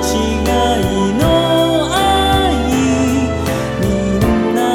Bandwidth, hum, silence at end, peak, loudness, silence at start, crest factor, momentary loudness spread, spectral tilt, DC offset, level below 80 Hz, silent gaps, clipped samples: 18.5 kHz; none; 0 s; -2 dBFS; -14 LUFS; 0 s; 12 dB; 4 LU; -5 dB/octave; under 0.1%; -26 dBFS; none; under 0.1%